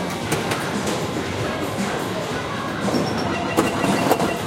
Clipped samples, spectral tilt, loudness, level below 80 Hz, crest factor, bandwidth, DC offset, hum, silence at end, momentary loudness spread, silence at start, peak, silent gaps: under 0.1%; -4.5 dB/octave; -23 LUFS; -48 dBFS; 20 dB; 16.5 kHz; under 0.1%; none; 0 s; 5 LU; 0 s; -4 dBFS; none